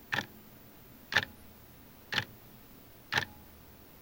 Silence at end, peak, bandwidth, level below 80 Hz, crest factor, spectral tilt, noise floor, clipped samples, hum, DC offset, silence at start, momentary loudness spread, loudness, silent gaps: 0 s; -10 dBFS; 17 kHz; -64 dBFS; 30 dB; -2.5 dB/octave; -55 dBFS; under 0.1%; none; under 0.1%; 0 s; 22 LU; -35 LUFS; none